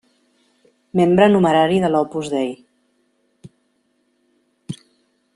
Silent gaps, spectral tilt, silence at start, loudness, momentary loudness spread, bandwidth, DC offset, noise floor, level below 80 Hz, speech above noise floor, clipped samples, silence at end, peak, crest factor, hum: none; -7 dB/octave; 0.95 s; -17 LUFS; 22 LU; 11 kHz; under 0.1%; -65 dBFS; -58 dBFS; 50 dB; under 0.1%; 0.6 s; -2 dBFS; 20 dB; none